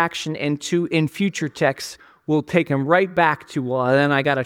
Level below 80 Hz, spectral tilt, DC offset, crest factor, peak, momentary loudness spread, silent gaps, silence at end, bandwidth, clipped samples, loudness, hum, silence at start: -62 dBFS; -5.5 dB/octave; under 0.1%; 18 dB; -2 dBFS; 8 LU; none; 0 s; 16.5 kHz; under 0.1%; -20 LUFS; none; 0 s